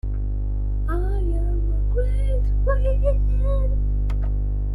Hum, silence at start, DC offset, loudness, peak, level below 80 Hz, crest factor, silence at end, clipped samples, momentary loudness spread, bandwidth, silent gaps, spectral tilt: 50 Hz at -20 dBFS; 0.05 s; under 0.1%; -24 LUFS; -8 dBFS; -20 dBFS; 12 dB; 0 s; under 0.1%; 5 LU; 3.2 kHz; none; -9.5 dB/octave